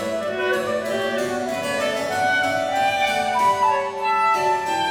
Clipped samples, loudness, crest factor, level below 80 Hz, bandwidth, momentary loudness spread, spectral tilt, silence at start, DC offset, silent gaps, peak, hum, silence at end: under 0.1%; -21 LUFS; 12 dB; -58 dBFS; over 20 kHz; 5 LU; -3 dB/octave; 0 s; under 0.1%; none; -8 dBFS; none; 0 s